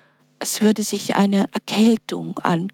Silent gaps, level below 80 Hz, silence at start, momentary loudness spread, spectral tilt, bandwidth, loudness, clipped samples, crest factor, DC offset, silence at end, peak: none; -68 dBFS; 0.4 s; 8 LU; -5 dB/octave; 18 kHz; -20 LUFS; under 0.1%; 18 dB; under 0.1%; 0.05 s; -2 dBFS